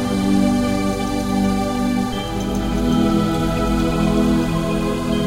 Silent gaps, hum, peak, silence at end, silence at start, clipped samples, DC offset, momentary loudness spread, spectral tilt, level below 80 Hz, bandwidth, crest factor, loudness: none; none; -6 dBFS; 0 s; 0 s; under 0.1%; under 0.1%; 5 LU; -6 dB/octave; -30 dBFS; 16 kHz; 14 dB; -19 LUFS